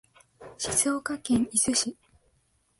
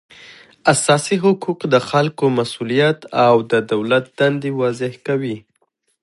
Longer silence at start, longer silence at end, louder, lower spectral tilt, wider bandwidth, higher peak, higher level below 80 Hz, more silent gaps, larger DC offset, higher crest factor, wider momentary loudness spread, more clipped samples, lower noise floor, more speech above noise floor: first, 0.4 s vs 0.2 s; first, 0.85 s vs 0.65 s; second, -26 LUFS vs -17 LUFS; second, -2 dB/octave vs -5 dB/octave; about the same, 12 kHz vs 11.5 kHz; second, -10 dBFS vs 0 dBFS; about the same, -60 dBFS vs -62 dBFS; neither; neither; about the same, 20 dB vs 18 dB; about the same, 9 LU vs 7 LU; neither; about the same, -69 dBFS vs -66 dBFS; second, 43 dB vs 49 dB